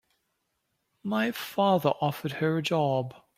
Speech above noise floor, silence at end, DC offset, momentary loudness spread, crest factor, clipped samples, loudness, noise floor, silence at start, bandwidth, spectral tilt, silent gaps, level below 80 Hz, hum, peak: 51 dB; 0.25 s; under 0.1%; 7 LU; 20 dB; under 0.1%; -28 LUFS; -78 dBFS; 1.05 s; 16 kHz; -6 dB/octave; none; -70 dBFS; none; -10 dBFS